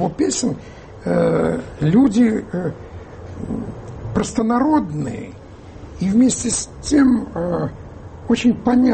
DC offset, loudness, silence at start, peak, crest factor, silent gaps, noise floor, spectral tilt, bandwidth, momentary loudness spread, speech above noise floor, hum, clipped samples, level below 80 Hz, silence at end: under 0.1%; -19 LUFS; 0 s; -4 dBFS; 14 dB; none; -37 dBFS; -5.5 dB/octave; 8.8 kHz; 21 LU; 20 dB; none; under 0.1%; -42 dBFS; 0 s